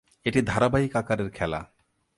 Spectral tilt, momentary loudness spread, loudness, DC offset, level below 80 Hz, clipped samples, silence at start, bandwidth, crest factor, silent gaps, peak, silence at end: -6.5 dB/octave; 8 LU; -26 LUFS; under 0.1%; -46 dBFS; under 0.1%; 0.25 s; 11.5 kHz; 20 dB; none; -8 dBFS; 0.5 s